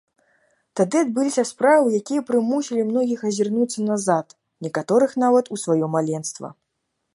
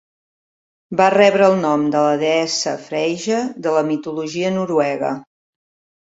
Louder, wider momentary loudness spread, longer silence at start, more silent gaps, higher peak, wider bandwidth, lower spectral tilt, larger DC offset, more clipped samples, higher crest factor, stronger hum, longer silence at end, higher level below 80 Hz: second, -21 LUFS vs -17 LUFS; about the same, 11 LU vs 11 LU; second, 0.75 s vs 0.9 s; neither; about the same, -4 dBFS vs -2 dBFS; first, 11.5 kHz vs 8 kHz; about the same, -5.5 dB/octave vs -4.5 dB/octave; neither; neither; about the same, 16 dB vs 16 dB; neither; second, 0.6 s vs 0.9 s; second, -74 dBFS vs -64 dBFS